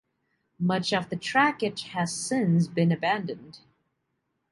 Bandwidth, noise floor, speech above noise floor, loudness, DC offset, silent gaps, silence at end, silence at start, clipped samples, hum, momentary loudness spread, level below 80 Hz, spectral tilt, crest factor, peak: 11.5 kHz; -78 dBFS; 52 dB; -26 LUFS; under 0.1%; none; 0.95 s; 0.6 s; under 0.1%; none; 8 LU; -68 dBFS; -5 dB/octave; 18 dB; -10 dBFS